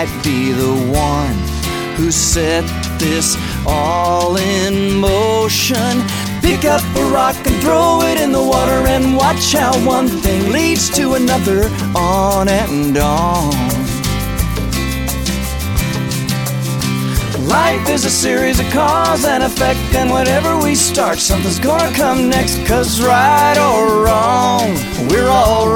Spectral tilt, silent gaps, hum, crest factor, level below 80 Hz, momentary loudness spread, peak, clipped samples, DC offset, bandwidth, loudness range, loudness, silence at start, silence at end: -4 dB/octave; none; none; 14 dB; -26 dBFS; 6 LU; 0 dBFS; under 0.1%; under 0.1%; over 20 kHz; 4 LU; -14 LUFS; 0 s; 0 s